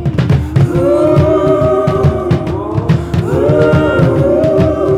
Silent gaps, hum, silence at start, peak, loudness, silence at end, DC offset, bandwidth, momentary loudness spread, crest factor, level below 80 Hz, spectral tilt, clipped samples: none; none; 0 s; 0 dBFS; -11 LUFS; 0 s; under 0.1%; 11.5 kHz; 5 LU; 10 dB; -26 dBFS; -9 dB/octave; under 0.1%